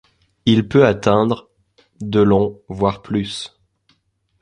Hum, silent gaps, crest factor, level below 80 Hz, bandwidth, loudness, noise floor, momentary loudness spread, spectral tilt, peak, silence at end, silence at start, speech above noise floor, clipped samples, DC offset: none; none; 18 dB; -46 dBFS; 10.5 kHz; -17 LUFS; -65 dBFS; 13 LU; -7 dB/octave; 0 dBFS; 0.95 s; 0.45 s; 48 dB; under 0.1%; under 0.1%